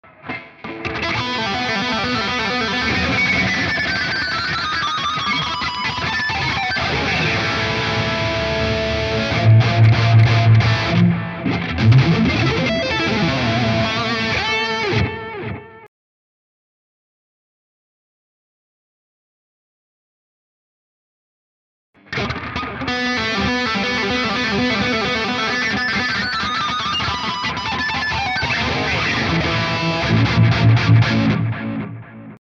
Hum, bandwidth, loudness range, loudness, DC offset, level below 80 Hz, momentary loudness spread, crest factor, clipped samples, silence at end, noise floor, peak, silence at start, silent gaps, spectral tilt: none; 7.4 kHz; 8 LU; -18 LUFS; under 0.1%; -38 dBFS; 10 LU; 16 dB; under 0.1%; 0.05 s; under -90 dBFS; -4 dBFS; 0.25 s; 15.88-21.93 s; -5.5 dB/octave